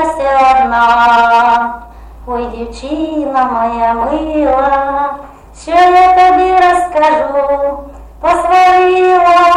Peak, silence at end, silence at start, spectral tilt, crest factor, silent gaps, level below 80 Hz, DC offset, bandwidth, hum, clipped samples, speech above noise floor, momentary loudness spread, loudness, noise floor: 0 dBFS; 0 s; 0 s; -4.5 dB/octave; 10 dB; none; -34 dBFS; under 0.1%; 11.5 kHz; none; under 0.1%; 21 dB; 13 LU; -10 LUFS; -31 dBFS